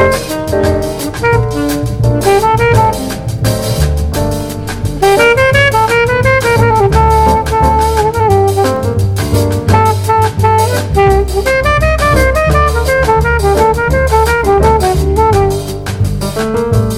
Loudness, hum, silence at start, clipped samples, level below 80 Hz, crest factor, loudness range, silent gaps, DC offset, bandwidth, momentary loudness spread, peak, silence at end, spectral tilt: -11 LUFS; none; 0 s; 0.2%; -20 dBFS; 10 dB; 3 LU; none; under 0.1%; 17 kHz; 7 LU; 0 dBFS; 0 s; -5.5 dB/octave